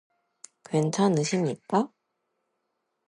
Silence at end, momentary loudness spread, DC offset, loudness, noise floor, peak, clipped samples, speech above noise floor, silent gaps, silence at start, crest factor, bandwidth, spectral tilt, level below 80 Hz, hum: 1.2 s; 6 LU; under 0.1%; -26 LUFS; -79 dBFS; -10 dBFS; under 0.1%; 54 dB; none; 0.7 s; 20 dB; 11 kHz; -6 dB/octave; -74 dBFS; none